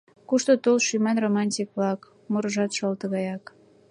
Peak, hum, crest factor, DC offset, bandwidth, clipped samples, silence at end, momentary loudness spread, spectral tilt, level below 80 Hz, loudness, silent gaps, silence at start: -8 dBFS; none; 18 dB; under 0.1%; 10.5 kHz; under 0.1%; 0.5 s; 9 LU; -4.5 dB/octave; -76 dBFS; -25 LUFS; none; 0.3 s